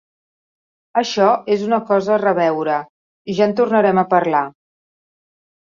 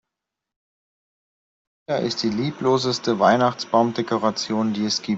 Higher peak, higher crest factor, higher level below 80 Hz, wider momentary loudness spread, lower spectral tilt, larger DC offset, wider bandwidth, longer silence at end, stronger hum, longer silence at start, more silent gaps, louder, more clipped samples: about the same, -2 dBFS vs -4 dBFS; about the same, 16 dB vs 20 dB; about the same, -64 dBFS vs -64 dBFS; about the same, 8 LU vs 6 LU; about the same, -6 dB/octave vs -5 dB/octave; neither; about the same, 7.4 kHz vs 8 kHz; first, 1.2 s vs 0 s; neither; second, 0.95 s vs 1.9 s; first, 2.90-3.25 s vs none; first, -17 LUFS vs -21 LUFS; neither